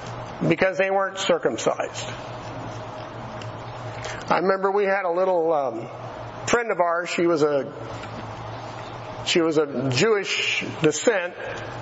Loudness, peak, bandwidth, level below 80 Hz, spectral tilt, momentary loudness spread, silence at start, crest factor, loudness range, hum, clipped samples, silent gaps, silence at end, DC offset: -23 LUFS; -6 dBFS; 8 kHz; -54 dBFS; -4.5 dB/octave; 14 LU; 0 s; 18 dB; 4 LU; none; under 0.1%; none; 0 s; under 0.1%